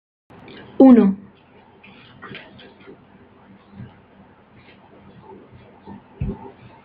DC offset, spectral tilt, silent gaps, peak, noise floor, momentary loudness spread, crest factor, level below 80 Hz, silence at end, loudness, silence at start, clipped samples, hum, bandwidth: under 0.1%; -10.5 dB/octave; none; -2 dBFS; -50 dBFS; 31 LU; 20 dB; -48 dBFS; 0.5 s; -15 LUFS; 0.8 s; under 0.1%; none; 4.3 kHz